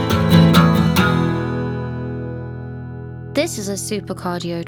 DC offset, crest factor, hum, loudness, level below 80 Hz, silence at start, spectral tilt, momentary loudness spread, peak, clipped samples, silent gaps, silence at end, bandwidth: under 0.1%; 16 dB; none; -18 LUFS; -38 dBFS; 0 s; -6 dB/octave; 18 LU; 0 dBFS; under 0.1%; none; 0 s; over 20 kHz